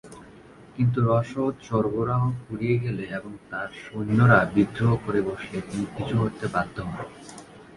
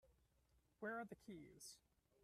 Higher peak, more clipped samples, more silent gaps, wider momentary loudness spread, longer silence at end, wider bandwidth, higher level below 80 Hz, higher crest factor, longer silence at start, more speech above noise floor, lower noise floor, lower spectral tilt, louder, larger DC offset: first, -4 dBFS vs -38 dBFS; neither; neither; first, 15 LU vs 10 LU; second, 0 s vs 0.45 s; second, 11.5 kHz vs 14 kHz; first, -52 dBFS vs -82 dBFS; about the same, 22 dB vs 18 dB; about the same, 0.05 s vs 0.05 s; about the same, 24 dB vs 26 dB; second, -48 dBFS vs -80 dBFS; first, -8 dB/octave vs -4 dB/octave; first, -25 LUFS vs -55 LUFS; neither